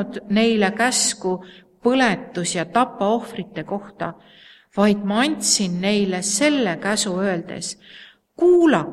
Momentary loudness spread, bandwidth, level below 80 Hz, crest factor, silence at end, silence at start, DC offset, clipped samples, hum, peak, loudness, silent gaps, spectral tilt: 13 LU; 14 kHz; -60 dBFS; 18 dB; 0 s; 0 s; under 0.1%; under 0.1%; none; -2 dBFS; -20 LUFS; none; -3.5 dB/octave